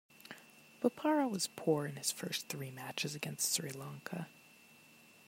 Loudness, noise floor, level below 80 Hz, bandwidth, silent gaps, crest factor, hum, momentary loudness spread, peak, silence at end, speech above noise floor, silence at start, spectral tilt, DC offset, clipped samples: -37 LUFS; -62 dBFS; -84 dBFS; 16 kHz; none; 22 dB; none; 17 LU; -18 dBFS; 0.2 s; 24 dB; 0.25 s; -3.5 dB/octave; under 0.1%; under 0.1%